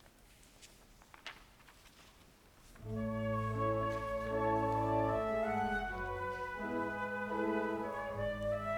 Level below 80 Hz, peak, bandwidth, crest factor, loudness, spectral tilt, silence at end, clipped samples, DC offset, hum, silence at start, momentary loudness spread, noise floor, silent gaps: -54 dBFS; -22 dBFS; 19 kHz; 16 dB; -37 LUFS; -7 dB/octave; 0 s; under 0.1%; under 0.1%; none; 0.25 s; 17 LU; -62 dBFS; none